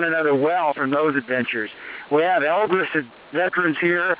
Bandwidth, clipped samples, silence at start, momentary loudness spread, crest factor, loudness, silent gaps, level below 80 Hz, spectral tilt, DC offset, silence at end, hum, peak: 4 kHz; under 0.1%; 0 s; 7 LU; 14 dB; -21 LUFS; none; -70 dBFS; -9 dB/octave; under 0.1%; 0 s; none; -6 dBFS